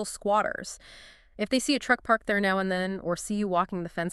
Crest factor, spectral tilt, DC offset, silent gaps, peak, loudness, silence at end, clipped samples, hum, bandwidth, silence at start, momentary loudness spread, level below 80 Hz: 20 dB; -4 dB/octave; under 0.1%; none; -8 dBFS; -27 LUFS; 0 s; under 0.1%; none; 13.5 kHz; 0 s; 10 LU; -56 dBFS